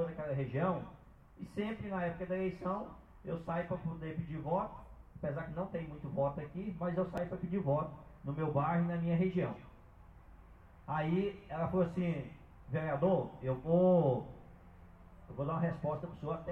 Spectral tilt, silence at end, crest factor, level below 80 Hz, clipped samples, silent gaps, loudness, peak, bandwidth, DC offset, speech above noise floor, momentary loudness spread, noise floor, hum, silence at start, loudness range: -10 dB/octave; 0 s; 18 dB; -58 dBFS; under 0.1%; none; -36 LUFS; -18 dBFS; 4.2 kHz; under 0.1%; 22 dB; 12 LU; -57 dBFS; none; 0 s; 6 LU